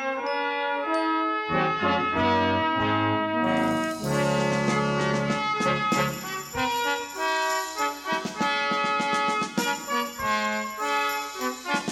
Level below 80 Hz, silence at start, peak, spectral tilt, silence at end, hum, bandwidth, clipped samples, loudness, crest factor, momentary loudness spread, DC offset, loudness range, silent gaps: -56 dBFS; 0 s; -12 dBFS; -4 dB/octave; 0 s; none; 19 kHz; under 0.1%; -25 LUFS; 14 dB; 5 LU; under 0.1%; 2 LU; none